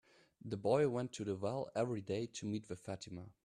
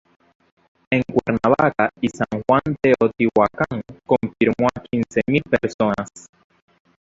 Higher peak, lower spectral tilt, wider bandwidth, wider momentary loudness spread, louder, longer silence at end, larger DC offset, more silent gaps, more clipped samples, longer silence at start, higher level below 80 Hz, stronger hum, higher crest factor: second, -20 dBFS vs -2 dBFS; about the same, -6 dB/octave vs -7 dB/octave; first, 11.5 kHz vs 7.8 kHz; first, 13 LU vs 7 LU; second, -40 LUFS vs -20 LUFS; second, 0.15 s vs 0.8 s; neither; second, none vs 5.74-5.79 s; neither; second, 0.45 s vs 0.9 s; second, -74 dBFS vs -50 dBFS; neither; about the same, 20 dB vs 18 dB